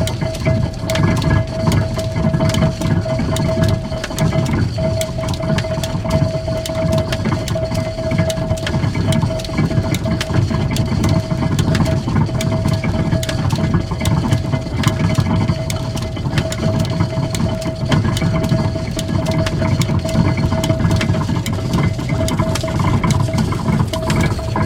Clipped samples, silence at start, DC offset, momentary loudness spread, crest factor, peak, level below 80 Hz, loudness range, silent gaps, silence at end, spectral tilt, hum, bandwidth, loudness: under 0.1%; 0 s; under 0.1%; 4 LU; 16 dB; 0 dBFS; -30 dBFS; 1 LU; none; 0 s; -6 dB/octave; none; 17.5 kHz; -18 LUFS